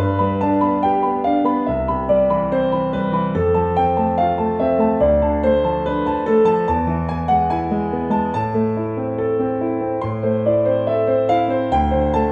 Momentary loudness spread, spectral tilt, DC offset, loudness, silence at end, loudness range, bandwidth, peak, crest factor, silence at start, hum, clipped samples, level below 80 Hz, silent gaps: 5 LU; -9.5 dB/octave; under 0.1%; -18 LUFS; 0 s; 3 LU; 7 kHz; -4 dBFS; 12 dB; 0 s; none; under 0.1%; -34 dBFS; none